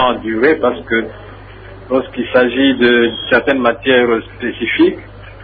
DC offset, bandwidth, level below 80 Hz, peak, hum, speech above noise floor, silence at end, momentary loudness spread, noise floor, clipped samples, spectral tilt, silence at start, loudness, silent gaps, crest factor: under 0.1%; 4.9 kHz; -42 dBFS; 0 dBFS; none; 20 dB; 0 s; 8 LU; -34 dBFS; under 0.1%; -8 dB/octave; 0 s; -14 LUFS; none; 14 dB